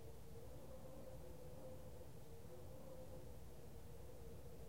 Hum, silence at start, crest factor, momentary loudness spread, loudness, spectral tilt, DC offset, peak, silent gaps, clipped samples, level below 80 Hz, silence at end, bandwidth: none; 0 s; 12 dB; 2 LU; -59 LUFS; -6 dB/octave; 0.2%; -44 dBFS; none; under 0.1%; -64 dBFS; 0 s; 16 kHz